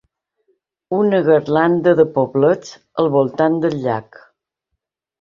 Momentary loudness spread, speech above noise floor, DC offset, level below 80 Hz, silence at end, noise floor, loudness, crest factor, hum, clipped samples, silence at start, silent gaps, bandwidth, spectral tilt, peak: 9 LU; 62 dB; under 0.1%; -60 dBFS; 1.2 s; -78 dBFS; -16 LUFS; 16 dB; none; under 0.1%; 0.9 s; none; 7.4 kHz; -7.5 dB/octave; -2 dBFS